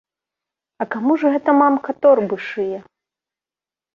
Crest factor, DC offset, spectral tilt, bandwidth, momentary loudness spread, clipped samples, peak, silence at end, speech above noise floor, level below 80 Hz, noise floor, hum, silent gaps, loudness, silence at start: 18 dB; under 0.1%; -8 dB/octave; 6.6 kHz; 12 LU; under 0.1%; -2 dBFS; 1.15 s; over 73 dB; -68 dBFS; under -90 dBFS; none; none; -17 LUFS; 0.8 s